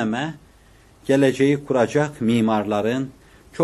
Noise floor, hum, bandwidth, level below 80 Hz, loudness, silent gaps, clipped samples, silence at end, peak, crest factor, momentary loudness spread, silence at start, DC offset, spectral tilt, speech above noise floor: -51 dBFS; none; 12.5 kHz; -56 dBFS; -20 LUFS; none; under 0.1%; 0 s; -4 dBFS; 16 dB; 14 LU; 0 s; under 0.1%; -6.5 dB/octave; 32 dB